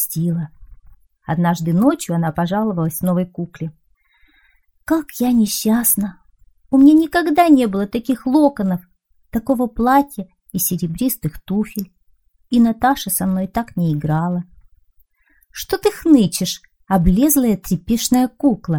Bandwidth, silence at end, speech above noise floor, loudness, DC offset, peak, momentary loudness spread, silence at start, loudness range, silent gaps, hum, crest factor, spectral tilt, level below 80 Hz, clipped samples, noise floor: over 20 kHz; 0 s; 42 dB; -17 LUFS; 0.2%; -2 dBFS; 13 LU; 0 s; 6 LU; none; none; 16 dB; -5.5 dB/octave; -38 dBFS; under 0.1%; -58 dBFS